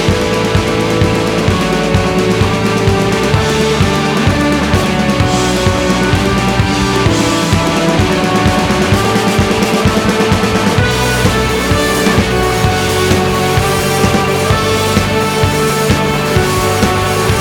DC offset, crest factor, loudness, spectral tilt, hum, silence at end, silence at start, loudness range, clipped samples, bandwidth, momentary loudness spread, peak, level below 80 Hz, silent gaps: under 0.1%; 10 dB; -12 LUFS; -5 dB/octave; none; 0 s; 0 s; 1 LU; under 0.1%; 19.5 kHz; 1 LU; 0 dBFS; -26 dBFS; none